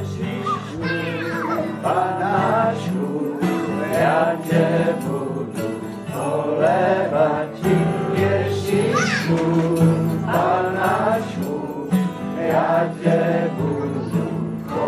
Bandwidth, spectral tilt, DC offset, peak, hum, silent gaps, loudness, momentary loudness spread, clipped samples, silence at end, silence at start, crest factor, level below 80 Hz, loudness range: 13.5 kHz; -7 dB/octave; under 0.1%; -4 dBFS; none; none; -21 LUFS; 8 LU; under 0.1%; 0 s; 0 s; 16 dB; -54 dBFS; 2 LU